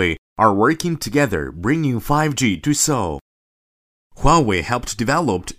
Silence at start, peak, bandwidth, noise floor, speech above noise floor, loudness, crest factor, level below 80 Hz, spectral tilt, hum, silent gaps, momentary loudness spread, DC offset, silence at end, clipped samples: 0 s; -2 dBFS; 16 kHz; under -90 dBFS; over 72 dB; -18 LUFS; 18 dB; -34 dBFS; -4.5 dB/octave; none; 0.18-0.36 s, 3.21-4.10 s; 7 LU; under 0.1%; 0.05 s; under 0.1%